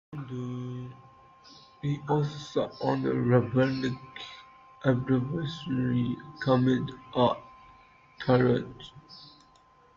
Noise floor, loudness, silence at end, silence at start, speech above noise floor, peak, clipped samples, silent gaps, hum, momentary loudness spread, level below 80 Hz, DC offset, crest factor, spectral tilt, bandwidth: -60 dBFS; -29 LUFS; 0.65 s; 0.1 s; 32 dB; -10 dBFS; under 0.1%; none; none; 18 LU; -60 dBFS; under 0.1%; 18 dB; -8 dB/octave; 7.2 kHz